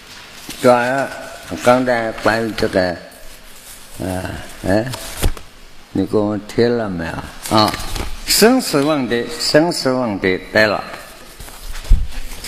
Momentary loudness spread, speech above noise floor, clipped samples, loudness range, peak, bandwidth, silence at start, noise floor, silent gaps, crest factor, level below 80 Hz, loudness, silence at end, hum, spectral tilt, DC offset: 20 LU; 21 dB; under 0.1%; 7 LU; 0 dBFS; 15 kHz; 0 s; -37 dBFS; none; 18 dB; -28 dBFS; -17 LUFS; 0 s; none; -4 dB/octave; under 0.1%